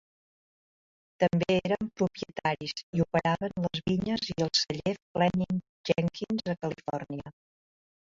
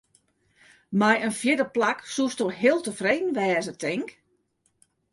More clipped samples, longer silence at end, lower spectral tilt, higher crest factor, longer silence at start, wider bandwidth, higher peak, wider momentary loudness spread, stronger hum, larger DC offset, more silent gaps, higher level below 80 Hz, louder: neither; second, 0.7 s vs 1 s; about the same, -5.5 dB/octave vs -4.5 dB/octave; about the same, 20 dB vs 18 dB; first, 1.2 s vs 0.9 s; second, 7.6 kHz vs 11.5 kHz; about the same, -10 dBFS vs -8 dBFS; about the same, 8 LU vs 8 LU; neither; neither; first, 2.83-2.93 s, 5.02-5.15 s, 5.69-5.84 s vs none; first, -58 dBFS vs -70 dBFS; second, -30 LUFS vs -25 LUFS